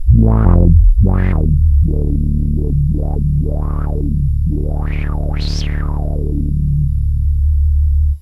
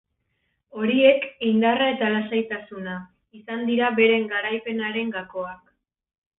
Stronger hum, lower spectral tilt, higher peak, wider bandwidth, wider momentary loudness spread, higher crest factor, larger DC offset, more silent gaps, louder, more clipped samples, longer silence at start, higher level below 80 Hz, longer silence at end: neither; about the same, -9 dB/octave vs -9.5 dB/octave; first, 0 dBFS vs -4 dBFS; first, 6.2 kHz vs 4 kHz; second, 9 LU vs 15 LU; second, 12 dB vs 20 dB; first, 0.6% vs under 0.1%; neither; first, -16 LUFS vs -22 LUFS; neither; second, 0 s vs 0.75 s; first, -14 dBFS vs -66 dBFS; second, 0 s vs 0.85 s